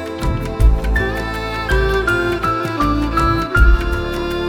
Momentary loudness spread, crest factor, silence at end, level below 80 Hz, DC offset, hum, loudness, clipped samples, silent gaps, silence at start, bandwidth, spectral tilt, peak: 7 LU; 16 dB; 0 s; -18 dBFS; under 0.1%; none; -17 LUFS; under 0.1%; none; 0 s; 15.5 kHz; -6.5 dB/octave; 0 dBFS